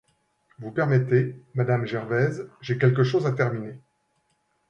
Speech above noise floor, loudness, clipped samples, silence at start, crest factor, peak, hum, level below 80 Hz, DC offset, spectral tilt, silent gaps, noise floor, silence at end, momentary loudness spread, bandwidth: 47 dB; -24 LUFS; under 0.1%; 0.6 s; 18 dB; -6 dBFS; none; -64 dBFS; under 0.1%; -8.5 dB/octave; none; -71 dBFS; 0.9 s; 13 LU; 7 kHz